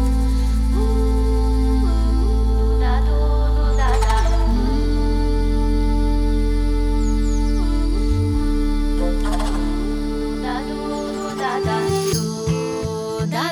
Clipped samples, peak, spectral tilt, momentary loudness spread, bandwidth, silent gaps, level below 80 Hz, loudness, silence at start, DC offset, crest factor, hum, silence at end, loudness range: under 0.1%; -6 dBFS; -6.5 dB/octave; 5 LU; 12.5 kHz; none; -18 dBFS; -21 LUFS; 0 s; under 0.1%; 12 dB; none; 0 s; 3 LU